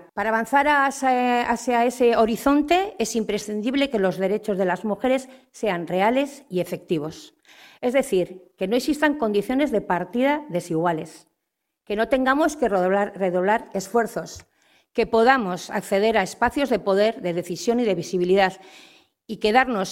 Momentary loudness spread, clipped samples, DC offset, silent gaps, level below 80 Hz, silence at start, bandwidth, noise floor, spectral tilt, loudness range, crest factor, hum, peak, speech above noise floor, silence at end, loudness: 9 LU; under 0.1%; under 0.1%; none; -54 dBFS; 0.15 s; 16.5 kHz; -80 dBFS; -5 dB/octave; 4 LU; 20 dB; none; -2 dBFS; 58 dB; 0 s; -22 LUFS